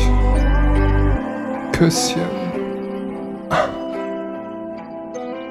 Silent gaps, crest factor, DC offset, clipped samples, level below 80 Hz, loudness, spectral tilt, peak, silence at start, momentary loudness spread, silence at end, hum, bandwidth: none; 16 dB; under 0.1%; under 0.1%; -22 dBFS; -21 LUFS; -5.5 dB/octave; -2 dBFS; 0 s; 12 LU; 0 s; none; 13 kHz